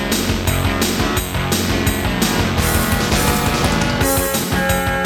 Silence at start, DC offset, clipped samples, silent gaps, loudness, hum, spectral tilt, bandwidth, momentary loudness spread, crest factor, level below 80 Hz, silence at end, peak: 0 s; under 0.1%; under 0.1%; none; -17 LUFS; none; -4 dB/octave; 19 kHz; 2 LU; 16 dB; -28 dBFS; 0 s; -2 dBFS